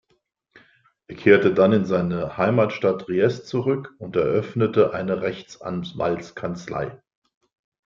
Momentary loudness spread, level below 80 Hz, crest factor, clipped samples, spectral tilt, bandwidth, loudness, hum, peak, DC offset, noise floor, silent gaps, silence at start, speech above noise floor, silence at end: 13 LU; -58 dBFS; 20 dB; under 0.1%; -7.5 dB/octave; 7.4 kHz; -22 LUFS; none; -2 dBFS; under 0.1%; -69 dBFS; none; 1.1 s; 48 dB; 0.9 s